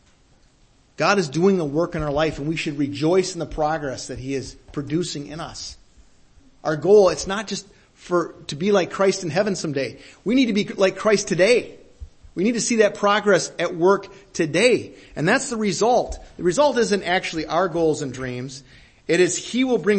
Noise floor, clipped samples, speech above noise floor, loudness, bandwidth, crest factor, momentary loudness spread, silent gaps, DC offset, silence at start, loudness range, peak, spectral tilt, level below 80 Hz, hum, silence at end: -57 dBFS; under 0.1%; 36 dB; -21 LUFS; 8.8 kHz; 18 dB; 13 LU; none; under 0.1%; 1 s; 4 LU; -2 dBFS; -4.5 dB/octave; -48 dBFS; none; 0 s